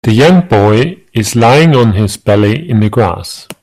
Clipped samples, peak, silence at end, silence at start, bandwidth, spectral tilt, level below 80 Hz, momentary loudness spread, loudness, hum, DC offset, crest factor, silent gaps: under 0.1%; 0 dBFS; 0.1 s; 0.05 s; 14.5 kHz; -6 dB/octave; -40 dBFS; 9 LU; -9 LUFS; none; under 0.1%; 8 dB; none